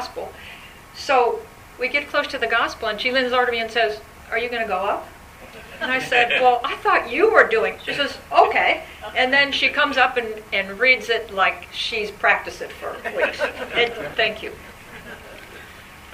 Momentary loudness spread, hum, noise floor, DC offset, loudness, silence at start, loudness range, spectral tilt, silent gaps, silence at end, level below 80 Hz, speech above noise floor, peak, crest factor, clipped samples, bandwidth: 22 LU; none; -42 dBFS; under 0.1%; -20 LUFS; 0 s; 5 LU; -3 dB/octave; none; 0 s; -50 dBFS; 21 dB; 0 dBFS; 22 dB; under 0.1%; 15.5 kHz